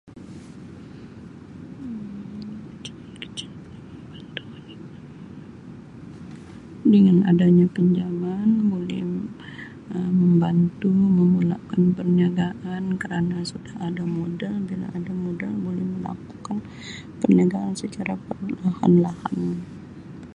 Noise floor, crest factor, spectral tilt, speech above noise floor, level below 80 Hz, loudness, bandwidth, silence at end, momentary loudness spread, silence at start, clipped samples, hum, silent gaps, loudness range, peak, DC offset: -41 dBFS; 18 dB; -8 dB/octave; 20 dB; -54 dBFS; -22 LUFS; 9.8 kHz; 0.05 s; 23 LU; 0.05 s; under 0.1%; none; none; 18 LU; -4 dBFS; under 0.1%